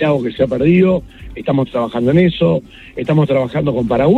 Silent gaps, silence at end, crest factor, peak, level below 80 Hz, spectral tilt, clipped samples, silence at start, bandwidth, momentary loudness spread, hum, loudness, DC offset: none; 0 s; 14 dB; 0 dBFS; -40 dBFS; -9 dB/octave; under 0.1%; 0 s; 7.8 kHz; 10 LU; none; -15 LUFS; under 0.1%